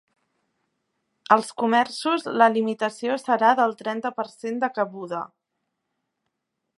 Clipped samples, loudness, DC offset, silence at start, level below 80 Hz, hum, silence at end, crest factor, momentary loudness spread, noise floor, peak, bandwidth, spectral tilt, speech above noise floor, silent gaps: under 0.1%; -23 LUFS; under 0.1%; 1.3 s; -82 dBFS; none; 1.55 s; 24 dB; 12 LU; -79 dBFS; -2 dBFS; 11.5 kHz; -4.5 dB/octave; 57 dB; none